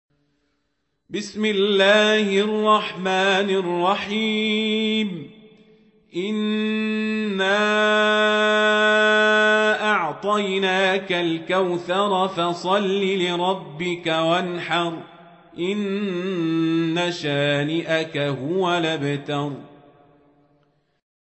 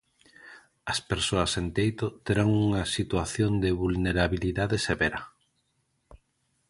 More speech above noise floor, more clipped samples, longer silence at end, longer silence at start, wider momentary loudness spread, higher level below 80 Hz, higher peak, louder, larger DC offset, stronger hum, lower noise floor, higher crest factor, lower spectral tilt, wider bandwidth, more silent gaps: first, 53 dB vs 47 dB; neither; first, 1.6 s vs 0.55 s; first, 1.1 s vs 0.45 s; first, 9 LU vs 6 LU; second, -68 dBFS vs -44 dBFS; about the same, -6 dBFS vs -8 dBFS; first, -20 LUFS vs -27 LUFS; neither; neither; about the same, -74 dBFS vs -74 dBFS; about the same, 16 dB vs 20 dB; about the same, -5 dB/octave vs -5 dB/octave; second, 8.4 kHz vs 11.5 kHz; neither